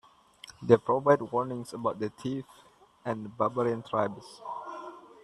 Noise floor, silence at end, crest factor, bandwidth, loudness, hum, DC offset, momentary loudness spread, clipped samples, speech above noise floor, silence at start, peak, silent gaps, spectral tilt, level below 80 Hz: -53 dBFS; 0.25 s; 26 dB; 12 kHz; -30 LUFS; none; under 0.1%; 18 LU; under 0.1%; 24 dB; 0.45 s; -4 dBFS; none; -7 dB/octave; -70 dBFS